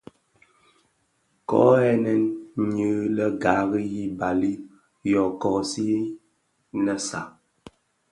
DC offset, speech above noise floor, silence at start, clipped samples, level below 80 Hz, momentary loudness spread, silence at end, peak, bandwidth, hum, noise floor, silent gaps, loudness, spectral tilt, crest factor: under 0.1%; 47 dB; 1.5 s; under 0.1%; -58 dBFS; 14 LU; 0.8 s; -4 dBFS; 11.5 kHz; none; -69 dBFS; none; -24 LUFS; -6 dB/octave; 22 dB